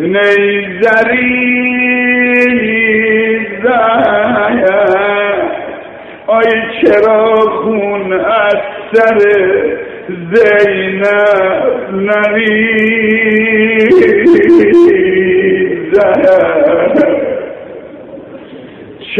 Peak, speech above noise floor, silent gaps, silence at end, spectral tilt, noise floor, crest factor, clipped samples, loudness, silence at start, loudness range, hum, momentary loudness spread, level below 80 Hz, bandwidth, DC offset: 0 dBFS; 21 dB; none; 0 s; -7 dB/octave; -30 dBFS; 10 dB; 0.3%; -9 LUFS; 0 s; 4 LU; none; 14 LU; -46 dBFS; 7.2 kHz; under 0.1%